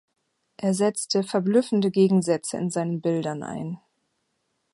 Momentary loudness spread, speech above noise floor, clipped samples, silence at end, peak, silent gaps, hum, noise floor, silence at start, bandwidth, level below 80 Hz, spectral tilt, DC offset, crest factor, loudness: 12 LU; 51 dB; under 0.1%; 1 s; -8 dBFS; none; none; -75 dBFS; 0.6 s; 11.5 kHz; -70 dBFS; -6 dB/octave; under 0.1%; 16 dB; -24 LUFS